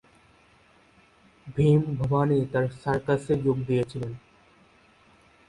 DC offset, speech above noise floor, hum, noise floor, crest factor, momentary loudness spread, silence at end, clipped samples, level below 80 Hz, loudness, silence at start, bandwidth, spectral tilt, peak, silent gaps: under 0.1%; 34 dB; none; -59 dBFS; 18 dB; 14 LU; 1.3 s; under 0.1%; -54 dBFS; -26 LUFS; 1.45 s; 11 kHz; -8.5 dB/octave; -10 dBFS; none